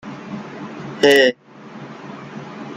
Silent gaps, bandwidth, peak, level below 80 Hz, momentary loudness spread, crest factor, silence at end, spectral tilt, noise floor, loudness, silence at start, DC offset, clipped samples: none; 13.5 kHz; 0 dBFS; -64 dBFS; 24 LU; 20 dB; 0 s; -4 dB/octave; -37 dBFS; -14 LUFS; 0.05 s; under 0.1%; under 0.1%